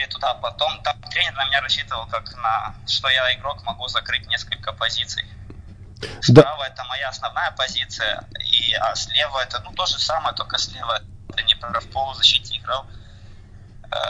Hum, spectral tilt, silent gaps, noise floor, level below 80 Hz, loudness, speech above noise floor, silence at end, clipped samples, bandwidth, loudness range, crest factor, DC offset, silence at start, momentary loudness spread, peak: 50 Hz at -45 dBFS; -4 dB/octave; none; -41 dBFS; -44 dBFS; -20 LUFS; 20 dB; 0 s; under 0.1%; 10.5 kHz; 3 LU; 22 dB; under 0.1%; 0 s; 12 LU; 0 dBFS